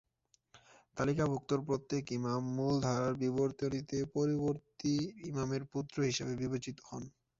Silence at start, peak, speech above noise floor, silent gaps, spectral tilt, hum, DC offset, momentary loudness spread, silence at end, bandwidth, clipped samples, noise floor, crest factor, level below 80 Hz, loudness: 0.55 s; -20 dBFS; 41 dB; none; -6.5 dB/octave; none; under 0.1%; 7 LU; 0.3 s; 7.6 kHz; under 0.1%; -76 dBFS; 16 dB; -64 dBFS; -36 LUFS